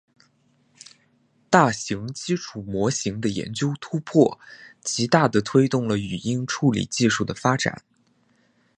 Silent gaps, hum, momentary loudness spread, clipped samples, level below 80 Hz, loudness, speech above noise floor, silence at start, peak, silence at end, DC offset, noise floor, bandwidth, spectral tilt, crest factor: none; none; 10 LU; under 0.1%; -56 dBFS; -23 LUFS; 41 dB; 1.5 s; 0 dBFS; 1 s; under 0.1%; -63 dBFS; 11 kHz; -5 dB/octave; 24 dB